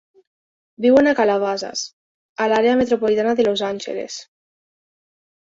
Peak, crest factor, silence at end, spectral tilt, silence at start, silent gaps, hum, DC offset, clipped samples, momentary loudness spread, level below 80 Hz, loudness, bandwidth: -2 dBFS; 18 dB; 1.25 s; -4 dB/octave; 0.8 s; 1.93-2.36 s; none; under 0.1%; under 0.1%; 16 LU; -58 dBFS; -18 LUFS; 7.8 kHz